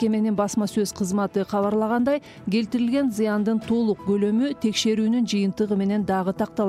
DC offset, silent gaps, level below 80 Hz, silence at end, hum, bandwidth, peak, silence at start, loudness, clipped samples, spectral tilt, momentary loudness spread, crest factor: under 0.1%; none; -56 dBFS; 0 s; none; 14 kHz; -10 dBFS; 0 s; -23 LUFS; under 0.1%; -5.5 dB/octave; 3 LU; 12 dB